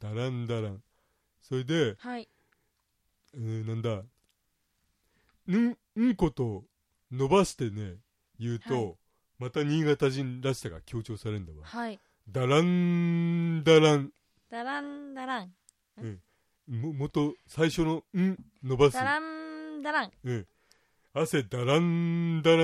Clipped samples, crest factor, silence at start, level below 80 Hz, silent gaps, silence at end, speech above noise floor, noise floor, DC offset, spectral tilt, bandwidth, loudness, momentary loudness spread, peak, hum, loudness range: under 0.1%; 22 dB; 0 s; -56 dBFS; none; 0 s; 48 dB; -77 dBFS; under 0.1%; -6.5 dB/octave; 13.5 kHz; -29 LUFS; 15 LU; -8 dBFS; none; 9 LU